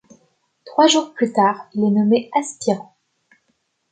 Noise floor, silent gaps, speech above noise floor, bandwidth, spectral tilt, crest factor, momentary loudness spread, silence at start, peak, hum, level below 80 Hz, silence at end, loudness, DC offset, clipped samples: -69 dBFS; none; 51 dB; 9.4 kHz; -4.5 dB/octave; 18 dB; 8 LU; 0.65 s; -2 dBFS; none; -72 dBFS; 1.1 s; -18 LUFS; under 0.1%; under 0.1%